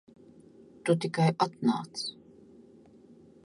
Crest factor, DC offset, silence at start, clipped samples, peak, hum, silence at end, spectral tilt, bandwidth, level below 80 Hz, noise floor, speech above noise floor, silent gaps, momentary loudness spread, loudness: 20 dB; under 0.1%; 0.85 s; under 0.1%; -12 dBFS; none; 1.3 s; -6 dB/octave; 11.5 kHz; -74 dBFS; -56 dBFS; 28 dB; none; 10 LU; -30 LUFS